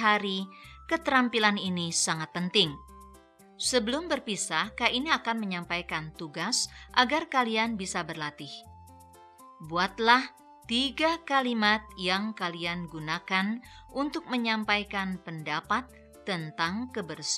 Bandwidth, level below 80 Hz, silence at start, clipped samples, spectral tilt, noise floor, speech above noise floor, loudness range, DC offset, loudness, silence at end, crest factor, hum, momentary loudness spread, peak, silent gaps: 15 kHz; -58 dBFS; 0 s; under 0.1%; -3 dB/octave; -55 dBFS; 26 dB; 4 LU; under 0.1%; -28 LUFS; 0 s; 24 dB; none; 11 LU; -6 dBFS; none